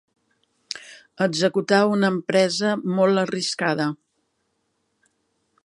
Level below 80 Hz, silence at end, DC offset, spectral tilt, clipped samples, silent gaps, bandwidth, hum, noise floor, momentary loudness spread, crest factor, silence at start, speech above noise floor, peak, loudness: -72 dBFS; 1.7 s; under 0.1%; -5 dB/octave; under 0.1%; none; 11.5 kHz; none; -72 dBFS; 15 LU; 20 dB; 0.75 s; 52 dB; -4 dBFS; -21 LUFS